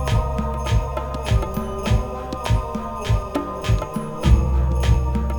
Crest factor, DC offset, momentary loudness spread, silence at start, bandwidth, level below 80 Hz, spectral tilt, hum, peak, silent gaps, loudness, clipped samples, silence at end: 18 dB; under 0.1%; 8 LU; 0 s; 18 kHz; -22 dBFS; -6.5 dB/octave; none; -2 dBFS; none; -22 LUFS; under 0.1%; 0 s